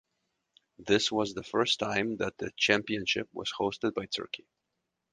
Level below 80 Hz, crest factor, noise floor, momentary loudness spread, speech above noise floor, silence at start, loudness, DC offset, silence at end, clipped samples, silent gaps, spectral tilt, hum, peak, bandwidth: -64 dBFS; 24 dB; -84 dBFS; 9 LU; 53 dB; 0.8 s; -30 LUFS; under 0.1%; 0.75 s; under 0.1%; none; -3.5 dB/octave; none; -8 dBFS; 9.8 kHz